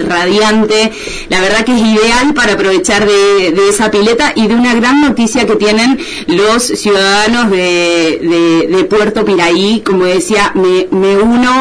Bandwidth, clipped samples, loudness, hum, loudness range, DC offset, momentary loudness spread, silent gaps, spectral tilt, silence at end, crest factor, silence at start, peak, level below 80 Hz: 11 kHz; under 0.1%; -9 LUFS; none; 1 LU; under 0.1%; 3 LU; none; -3.5 dB/octave; 0 s; 8 dB; 0 s; 0 dBFS; -36 dBFS